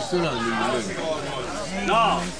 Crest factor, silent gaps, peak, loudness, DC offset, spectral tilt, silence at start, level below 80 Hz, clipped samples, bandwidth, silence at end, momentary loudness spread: 14 dB; none; -10 dBFS; -24 LUFS; 0.8%; -4 dB/octave; 0 s; -46 dBFS; under 0.1%; 10.5 kHz; 0 s; 9 LU